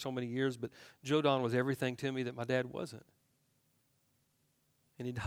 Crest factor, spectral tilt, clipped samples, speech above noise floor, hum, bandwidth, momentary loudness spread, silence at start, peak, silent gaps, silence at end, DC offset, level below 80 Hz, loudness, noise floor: 22 dB; -6 dB/octave; under 0.1%; 41 dB; none; 16 kHz; 15 LU; 0 s; -16 dBFS; none; 0 s; under 0.1%; -76 dBFS; -36 LUFS; -76 dBFS